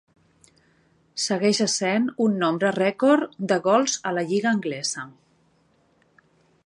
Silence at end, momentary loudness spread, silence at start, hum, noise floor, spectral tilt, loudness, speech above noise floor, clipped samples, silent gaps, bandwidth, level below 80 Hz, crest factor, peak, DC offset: 1.55 s; 8 LU; 1.15 s; none; -63 dBFS; -4 dB/octave; -23 LUFS; 41 dB; under 0.1%; none; 11.5 kHz; -74 dBFS; 18 dB; -6 dBFS; under 0.1%